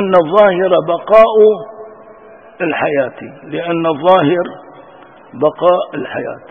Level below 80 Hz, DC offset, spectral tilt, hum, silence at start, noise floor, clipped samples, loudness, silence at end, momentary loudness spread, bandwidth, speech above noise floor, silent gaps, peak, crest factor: -54 dBFS; under 0.1%; -8 dB/octave; none; 0 s; -39 dBFS; 0.2%; -13 LUFS; 0.1 s; 15 LU; 5.6 kHz; 27 dB; none; 0 dBFS; 14 dB